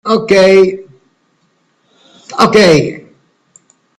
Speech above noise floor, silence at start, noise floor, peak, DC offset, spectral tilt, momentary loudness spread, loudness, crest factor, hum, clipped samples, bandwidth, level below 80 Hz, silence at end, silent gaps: 50 dB; 0.05 s; -58 dBFS; 0 dBFS; under 0.1%; -5 dB/octave; 19 LU; -9 LUFS; 12 dB; none; under 0.1%; 12 kHz; -48 dBFS; 1 s; none